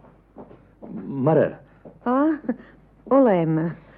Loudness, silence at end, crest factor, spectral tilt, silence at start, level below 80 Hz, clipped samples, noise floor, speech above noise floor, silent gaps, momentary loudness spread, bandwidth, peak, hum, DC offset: -22 LUFS; 0.2 s; 18 dB; -12.5 dB/octave; 0.4 s; -58 dBFS; under 0.1%; -46 dBFS; 26 dB; none; 16 LU; 3.7 kHz; -6 dBFS; none; under 0.1%